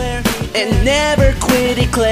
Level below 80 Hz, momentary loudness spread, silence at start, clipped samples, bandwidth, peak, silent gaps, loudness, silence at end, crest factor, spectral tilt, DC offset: -22 dBFS; 5 LU; 0 s; under 0.1%; 16 kHz; -2 dBFS; none; -14 LUFS; 0 s; 12 dB; -4.5 dB/octave; under 0.1%